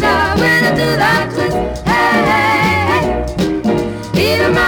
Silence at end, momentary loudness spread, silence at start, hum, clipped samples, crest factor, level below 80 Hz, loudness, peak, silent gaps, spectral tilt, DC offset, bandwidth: 0 s; 6 LU; 0 s; none; under 0.1%; 12 dB; -30 dBFS; -13 LUFS; -2 dBFS; none; -5.5 dB/octave; under 0.1%; over 20 kHz